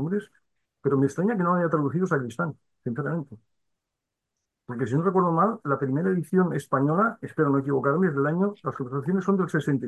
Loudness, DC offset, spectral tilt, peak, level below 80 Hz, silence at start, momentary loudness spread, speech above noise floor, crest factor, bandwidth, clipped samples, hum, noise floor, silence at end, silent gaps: -25 LUFS; under 0.1%; -9 dB/octave; -10 dBFS; -68 dBFS; 0 s; 9 LU; 60 dB; 16 dB; 12 kHz; under 0.1%; none; -84 dBFS; 0 s; none